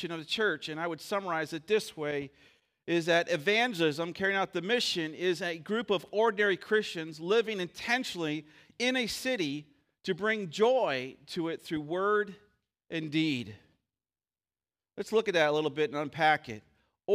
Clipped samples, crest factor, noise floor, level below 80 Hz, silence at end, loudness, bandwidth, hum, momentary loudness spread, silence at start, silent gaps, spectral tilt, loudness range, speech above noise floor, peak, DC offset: under 0.1%; 20 dB; under -90 dBFS; -72 dBFS; 0 s; -30 LUFS; 15.5 kHz; none; 11 LU; 0 s; none; -4 dB/octave; 5 LU; over 59 dB; -12 dBFS; under 0.1%